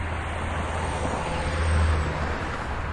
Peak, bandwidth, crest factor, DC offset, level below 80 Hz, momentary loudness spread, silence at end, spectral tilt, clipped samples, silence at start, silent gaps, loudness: -12 dBFS; 10.5 kHz; 14 dB; under 0.1%; -32 dBFS; 6 LU; 0 s; -5.5 dB/octave; under 0.1%; 0 s; none; -27 LUFS